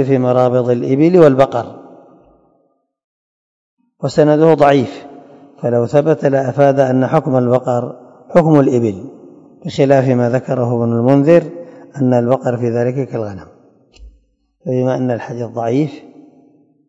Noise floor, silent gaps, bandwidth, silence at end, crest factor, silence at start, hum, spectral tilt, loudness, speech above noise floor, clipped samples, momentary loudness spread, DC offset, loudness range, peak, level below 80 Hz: -61 dBFS; 3.04-3.77 s; 8 kHz; 0.9 s; 14 dB; 0 s; none; -8.5 dB/octave; -14 LUFS; 48 dB; 0.3%; 15 LU; under 0.1%; 7 LU; 0 dBFS; -52 dBFS